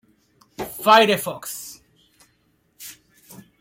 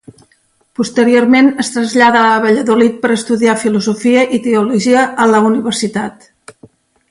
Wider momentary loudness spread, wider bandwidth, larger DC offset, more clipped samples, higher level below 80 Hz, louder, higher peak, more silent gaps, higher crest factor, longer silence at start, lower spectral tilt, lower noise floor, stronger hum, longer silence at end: first, 25 LU vs 8 LU; first, 16.5 kHz vs 11.5 kHz; neither; neither; second, -64 dBFS vs -56 dBFS; second, -18 LUFS vs -11 LUFS; about the same, -2 dBFS vs 0 dBFS; neither; first, 22 dB vs 12 dB; second, 0.6 s vs 0.8 s; second, -3 dB/octave vs -4.5 dB/octave; first, -65 dBFS vs -56 dBFS; neither; second, 0.7 s vs 1 s